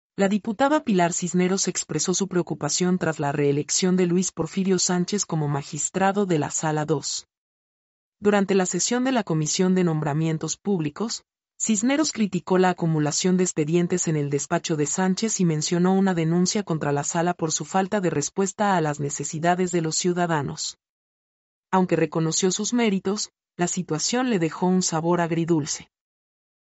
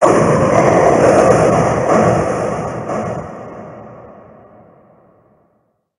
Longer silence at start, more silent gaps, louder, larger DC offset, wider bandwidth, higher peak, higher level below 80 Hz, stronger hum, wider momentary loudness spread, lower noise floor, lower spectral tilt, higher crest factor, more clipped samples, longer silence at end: first, 0.2 s vs 0 s; first, 7.37-8.12 s, 20.89-21.63 s vs none; second, -23 LUFS vs -13 LUFS; neither; second, 8.2 kHz vs 11.5 kHz; second, -8 dBFS vs 0 dBFS; second, -64 dBFS vs -40 dBFS; neither; second, 5 LU vs 21 LU; first, under -90 dBFS vs -62 dBFS; second, -4.5 dB/octave vs -6.5 dB/octave; about the same, 16 dB vs 14 dB; neither; second, 0.95 s vs 1.9 s